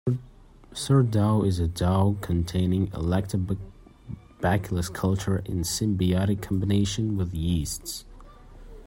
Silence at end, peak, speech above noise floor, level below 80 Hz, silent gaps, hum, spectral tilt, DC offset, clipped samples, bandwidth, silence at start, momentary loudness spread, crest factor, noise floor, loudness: 0 s; -10 dBFS; 25 dB; -44 dBFS; none; none; -6 dB/octave; under 0.1%; under 0.1%; 16.5 kHz; 0.05 s; 12 LU; 16 dB; -50 dBFS; -26 LUFS